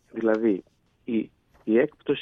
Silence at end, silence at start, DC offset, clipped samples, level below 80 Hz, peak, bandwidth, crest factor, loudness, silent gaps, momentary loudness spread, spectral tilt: 0 s; 0.15 s; under 0.1%; under 0.1%; -66 dBFS; -10 dBFS; 5.2 kHz; 16 dB; -26 LUFS; none; 15 LU; -8 dB/octave